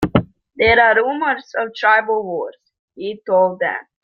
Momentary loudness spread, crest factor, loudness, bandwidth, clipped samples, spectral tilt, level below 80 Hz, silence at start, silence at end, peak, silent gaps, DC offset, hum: 16 LU; 16 dB; -17 LUFS; 7.4 kHz; under 0.1%; -6.5 dB/octave; -46 dBFS; 0 s; 0.2 s; -2 dBFS; 2.79-2.88 s; under 0.1%; none